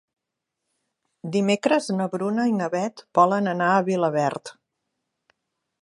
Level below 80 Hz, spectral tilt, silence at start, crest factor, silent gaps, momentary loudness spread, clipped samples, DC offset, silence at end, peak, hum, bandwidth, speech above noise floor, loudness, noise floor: -74 dBFS; -6 dB/octave; 1.25 s; 20 dB; none; 8 LU; under 0.1%; under 0.1%; 1.3 s; -4 dBFS; none; 11.5 kHz; 61 dB; -23 LUFS; -83 dBFS